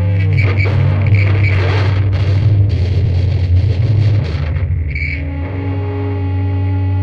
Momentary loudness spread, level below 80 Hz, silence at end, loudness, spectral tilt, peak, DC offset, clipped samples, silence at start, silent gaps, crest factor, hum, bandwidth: 7 LU; -26 dBFS; 0 s; -15 LUFS; -8.5 dB/octave; -2 dBFS; under 0.1%; under 0.1%; 0 s; none; 12 dB; none; 5.6 kHz